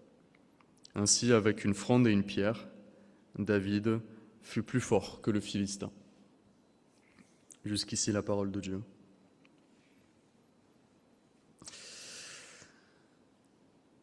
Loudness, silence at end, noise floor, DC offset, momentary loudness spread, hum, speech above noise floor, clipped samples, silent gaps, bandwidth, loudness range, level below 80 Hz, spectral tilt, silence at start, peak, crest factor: -32 LUFS; 1.45 s; -67 dBFS; under 0.1%; 22 LU; none; 35 dB; under 0.1%; none; 12 kHz; 21 LU; -70 dBFS; -4.5 dB/octave; 0.95 s; -12 dBFS; 24 dB